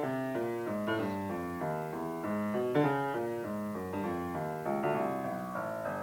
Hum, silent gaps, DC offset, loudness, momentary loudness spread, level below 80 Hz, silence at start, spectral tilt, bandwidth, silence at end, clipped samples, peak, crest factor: none; none; under 0.1%; -35 LUFS; 6 LU; -68 dBFS; 0 s; -7 dB/octave; 19 kHz; 0 s; under 0.1%; -16 dBFS; 18 dB